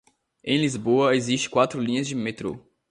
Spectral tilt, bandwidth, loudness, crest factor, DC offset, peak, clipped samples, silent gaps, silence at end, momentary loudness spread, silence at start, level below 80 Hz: -4.5 dB/octave; 11 kHz; -24 LUFS; 18 dB; under 0.1%; -6 dBFS; under 0.1%; none; 0.3 s; 13 LU; 0.45 s; -62 dBFS